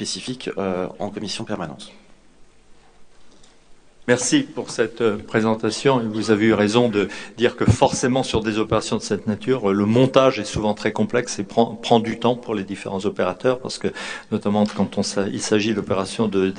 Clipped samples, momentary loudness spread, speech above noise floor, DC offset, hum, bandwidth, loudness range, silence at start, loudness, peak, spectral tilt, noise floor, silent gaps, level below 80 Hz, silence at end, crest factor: under 0.1%; 10 LU; 28 dB; under 0.1%; none; 10 kHz; 8 LU; 0 s; -21 LUFS; 0 dBFS; -5 dB/octave; -48 dBFS; none; -46 dBFS; 0 s; 22 dB